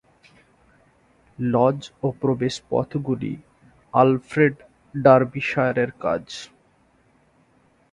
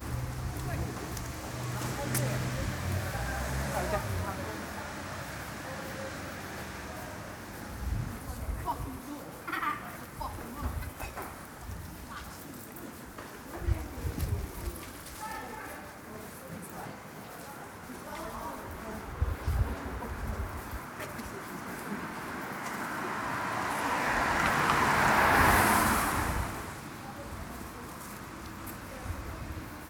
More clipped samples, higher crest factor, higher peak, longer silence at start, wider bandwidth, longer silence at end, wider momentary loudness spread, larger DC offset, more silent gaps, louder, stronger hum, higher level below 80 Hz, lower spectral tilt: neither; about the same, 22 dB vs 24 dB; first, 0 dBFS vs -10 dBFS; first, 1.4 s vs 0 s; second, 11 kHz vs over 20 kHz; first, 1.45 s vs 0 s; about the same, 18 LU vs 16 LU; neither; neither; first, -22 LUFS vs -34 LUFS; neither; second, -58 dBFS vs -44 dBFS; first, -7 dB/octave vs -4.5 dB/octave